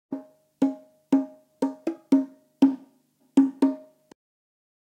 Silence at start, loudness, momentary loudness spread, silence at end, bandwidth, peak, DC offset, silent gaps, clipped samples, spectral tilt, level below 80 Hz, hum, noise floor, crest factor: 0.1 s; -25 LUFS; 16 LU; 1.1 s; 9 kHz; -8 dBFS; under 0.1%; none; under 0.1%; -7 dB/octave; -74 dBFS; none; -64 dBFS; 20 dB